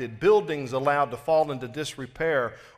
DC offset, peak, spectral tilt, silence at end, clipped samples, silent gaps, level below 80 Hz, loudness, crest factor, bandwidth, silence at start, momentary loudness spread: under 0.1%; -10 dBFS; -5.5 dB/octave; 0.1 s; under 0.1%; none; -58 dBFS; -25 LUFS; 16 dB; 14.5 kHz; 0 s; 11 LU